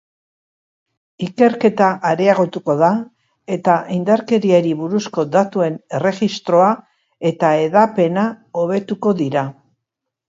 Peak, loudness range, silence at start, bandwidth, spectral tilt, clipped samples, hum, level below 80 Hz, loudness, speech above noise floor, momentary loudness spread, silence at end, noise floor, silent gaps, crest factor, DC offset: 0 dBFS; 1 LU; 1.2 s; 7.8 kHz; -7 dB/octave; under 0.1%; none; -64 dBFS; -17 LUFS; 64 dB; 8 LU; 0.75 s; -80 dBFS; none; 16 dB; under 0.1%